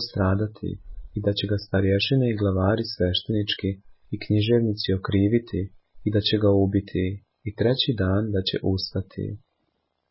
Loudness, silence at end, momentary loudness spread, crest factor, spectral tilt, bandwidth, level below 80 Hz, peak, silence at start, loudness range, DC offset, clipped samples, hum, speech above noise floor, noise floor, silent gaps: -24 LUFS; 0.75 s; 13 LU; 18 dB; -10.5 dB/octave; 5.8 kHz; -40 dBFS; -8 dBFS; 0 s; 1 LU; under 0.1%; under 0.1%; none; 51 dB; -74 dBFS; none